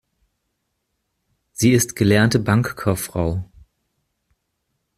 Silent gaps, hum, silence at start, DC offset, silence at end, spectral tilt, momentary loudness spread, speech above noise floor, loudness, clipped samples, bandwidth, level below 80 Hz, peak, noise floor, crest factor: none; none; 1.6 s; under 0.1%; 1.55 s; -5.5 dB/octave; 9 LU; 56 dB; -19 LUFS; under 0.1%; 15.5 kHz; -46 dBFS; -2 dBFS; -74 dBFS; 20 dB